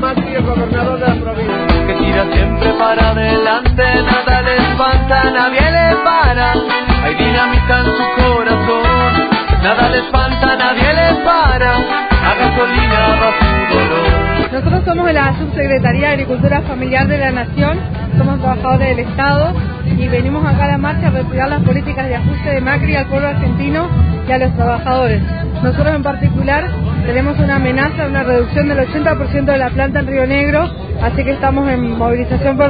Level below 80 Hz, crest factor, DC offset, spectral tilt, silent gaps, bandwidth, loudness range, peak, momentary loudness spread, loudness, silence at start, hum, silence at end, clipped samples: -22 dBFS; 12 dB; under 0.1%; -10 dB/octave; none; 5 kHz; 3 LU; 0 dBFS; 5 LU; -13 LUFS; 0 s; none; 0 s; under 0.1%